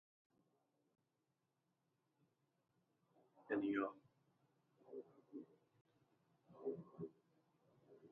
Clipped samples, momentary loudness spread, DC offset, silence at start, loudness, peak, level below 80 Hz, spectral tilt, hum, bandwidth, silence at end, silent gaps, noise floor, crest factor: under 0.1%; 21 LU; under 0.1%; 3.4 s; -48 LUFS; -30 dBFS; under -90 dBFS; -5.5 dB/octave; none; 4 kHz; 0.05 s; 5.81-5.85 s; -88 dBFS; 24 dB